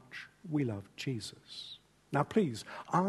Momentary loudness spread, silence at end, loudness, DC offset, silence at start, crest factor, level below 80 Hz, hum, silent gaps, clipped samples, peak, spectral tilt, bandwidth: 16 LU; 0 s; -36 LUFS; under 0.1%; 0.1 s; 22 dB; -72 dBFS; none; none; under 0.1%; -14 dBFS; -6 dB/octave; 12.5 kHz